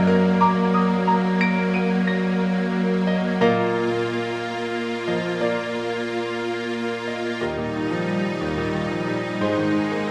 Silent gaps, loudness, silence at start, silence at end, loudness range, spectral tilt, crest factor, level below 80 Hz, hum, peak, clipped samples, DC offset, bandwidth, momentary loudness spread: none; -22 LUFS; 0 s; 0 s; 5 LU; -7 dB/octave; 16 dB; -52 dBFS; none; -6 dBFS; under 0.1%; under 0.1%; 9.4 kHz; 7 LU